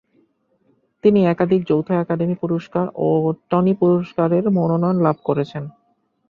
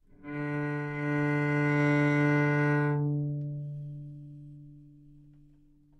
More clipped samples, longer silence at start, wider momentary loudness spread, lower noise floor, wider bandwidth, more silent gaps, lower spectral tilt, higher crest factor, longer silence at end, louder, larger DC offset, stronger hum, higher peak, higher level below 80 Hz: neither; first, 1.05 s vs 0.2 s; second, 7 LU vs 20 LU; about the same, -62 dBFS vs -60 dBFS; second, 5.2 kHz vs 7.6 kHz; neither; first, -10.5 dB/octave vs -8.5 dB/octave; about the same, 16 dB vs 14 dB; second, 0.6 s vs 1.15 s; first, -19 LUFS vs -29 LUFS; neither; neither; first, -2 dBFS vs -16 dBFS; first, -58 dBFS vs -64 dBFS